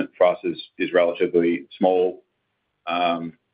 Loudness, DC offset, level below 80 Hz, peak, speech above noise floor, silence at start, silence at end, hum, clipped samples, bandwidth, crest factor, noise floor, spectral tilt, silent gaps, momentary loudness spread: -22 LUFS; under 0.1%; -70 dBFS; -4 dBFS; 53 dB; 0 s; 0.25 s; none; under 0.1%; 5 kHz; 18 dB; -74 dBFS; -10 dB/octave; none; 9 LU